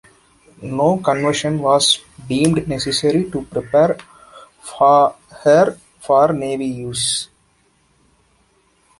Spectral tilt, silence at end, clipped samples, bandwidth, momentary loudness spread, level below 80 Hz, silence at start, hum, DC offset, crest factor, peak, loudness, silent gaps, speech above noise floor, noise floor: -4.5 dB/octave; 1.75 s; under 0.1%; 11.5 kHz; 12 LU; -50 dBFS; 0.6 s; none; under 0.1%; 18 dB; 0 dBFS; -17 LUFS; none; 43 dB; -59 dBFS